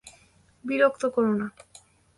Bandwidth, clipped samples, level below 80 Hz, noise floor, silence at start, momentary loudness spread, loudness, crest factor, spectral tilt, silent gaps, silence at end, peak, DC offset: 11.5 kHz; under 0.1%; -68 dBFS; -59 dBFS; 0.05 s; 14 LU; -25 LUFS; 20 dB; -6 dB/octave; none; 0.65 s; -8 dBFS; under 0.1%